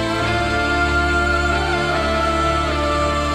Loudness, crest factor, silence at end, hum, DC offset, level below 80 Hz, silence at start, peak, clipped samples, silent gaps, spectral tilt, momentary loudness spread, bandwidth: -18 LUFS; 12 dB; 0 s; none; under 0.1%; -26 dBFS; 0 s; -6 dBFS; under 0.1%; none; -5 dB/octave; 2 LU; 13.5 kHz